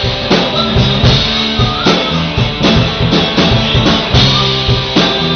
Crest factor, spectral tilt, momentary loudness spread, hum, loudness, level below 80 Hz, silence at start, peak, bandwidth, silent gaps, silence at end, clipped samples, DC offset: 10 dB; -3.5 dB/octave; 3 LU; none; -10 LUFS; -24 dBFS; 0 s; 0 dBFS; 6.6 kHz; none; 0 s; under 0.1%; under 0.1%